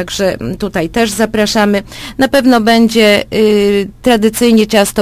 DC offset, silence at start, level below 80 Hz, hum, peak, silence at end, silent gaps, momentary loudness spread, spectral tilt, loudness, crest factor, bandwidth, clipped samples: under 0.1%; 0 s; -36 dBFS; none; 0 dBFS; 0 s; none; 8 LU; -4.5 dB/octave; -11 LUFS; 10 dB; 15.5 kHz; 0.5%